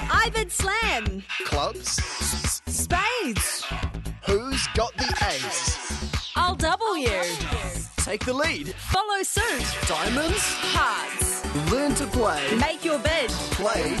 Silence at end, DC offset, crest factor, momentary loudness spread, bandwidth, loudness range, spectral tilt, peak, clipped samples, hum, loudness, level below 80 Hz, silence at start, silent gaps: 0 s; under 0.1%; 14 dB; 6 LU; 12.5 kHz; 2 LU; -3 dB/octave; -10 dBFS; under 0.1%; none; -25 LUFS; -34 dBFS; 0 s; none